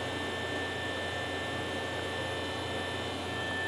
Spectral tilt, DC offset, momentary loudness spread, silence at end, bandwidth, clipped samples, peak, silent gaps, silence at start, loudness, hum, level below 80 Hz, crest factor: -4 dB/octave; under 0.1%; 1 LU; 0 s; 16 kHz; under 0.1%; -22 dBFS; none; 0 s; -34 LUFS; none; -64 dBFS; 12 dB